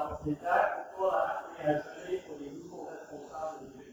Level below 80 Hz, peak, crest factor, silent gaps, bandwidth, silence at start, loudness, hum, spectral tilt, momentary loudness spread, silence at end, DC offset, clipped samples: -62 dBFS; -14 dBFS; 20 dB; none; over 20 kHz; 0 s; -33 LUFS; none; -6 dB/octave; 16 LU; 0 s; under 0.1%; under 0.1%